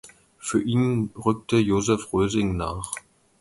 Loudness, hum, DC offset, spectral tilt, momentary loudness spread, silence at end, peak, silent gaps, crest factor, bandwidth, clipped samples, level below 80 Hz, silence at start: -24 LUFS; none; under 0.1%; -6 dB/octave; 11 LU; 0.4 s; -6 dBFS; none; 18 dB; 11.5 kHz; under 0.1%; -44 dBFS; 0.05 s